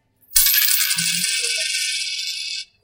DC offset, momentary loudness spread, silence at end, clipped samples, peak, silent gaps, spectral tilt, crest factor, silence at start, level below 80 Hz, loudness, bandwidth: under 0.1%; 11 LU; 0.2 s; under 0.1%; 0 dBFS; none; 1.5 dB/octave; 22 dB; 0.3 s; -48 dBFS; -17 LUFS; 18 kHz